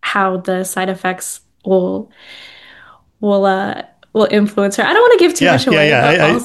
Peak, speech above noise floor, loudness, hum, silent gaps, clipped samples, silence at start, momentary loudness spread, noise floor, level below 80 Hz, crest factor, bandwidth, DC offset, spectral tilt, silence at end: 0 dBFS; 31 dB; -13 LUFS; none; none; under 0.1%; 0.05 s; 15 LU; -44 dBFS; -54 dBFS; 14 dB; 12.5 kHz; under 0.1%; -4.5 dB/octave; 0 s